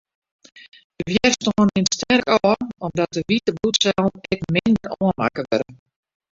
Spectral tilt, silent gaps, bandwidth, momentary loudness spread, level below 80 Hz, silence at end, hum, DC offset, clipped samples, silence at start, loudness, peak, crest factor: -4.5 dB/octave; 0.84-0.90 s; 7.8 kHz; 6 LU; -50 dBFS; 0.6 s; none; under 0.1%; under 0.1%; 0.55 s; -20 LUFS; -2 dBFS; 20 dB